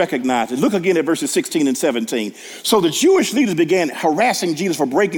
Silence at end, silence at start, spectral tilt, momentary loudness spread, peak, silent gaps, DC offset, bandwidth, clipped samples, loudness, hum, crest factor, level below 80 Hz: 0 s; 0 s; -4 dB/octave; 6 LU; -2 dBFS; none; under 0.1%; 18 kHz; under 0.1%; -17 LUFS; none; 14 dB; -62 dBFS